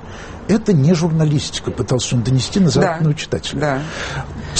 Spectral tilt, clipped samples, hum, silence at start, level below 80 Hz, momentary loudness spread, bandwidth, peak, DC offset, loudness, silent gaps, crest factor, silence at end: -5.5 dB/octave; under 0.1%; none; 0 s; -38 dBFS; 10 LU; 8.8 kHz; -2 dBFS; under 0.1%; -17 LUFS; none; 14 dB; 0 s